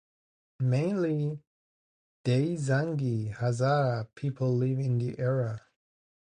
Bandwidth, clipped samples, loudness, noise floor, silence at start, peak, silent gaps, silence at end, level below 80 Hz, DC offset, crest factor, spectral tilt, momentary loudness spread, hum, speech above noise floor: 10 kHz; under 0.1%; -29 LUFS; under -90 dBFS; 0.6 s; -14 dBFS; 1.47-2.24 s; 0.65 s; -64 dBFS; under 0.1%; 14 dB; -8 dB/octave; 8 LU; none; over 62 dB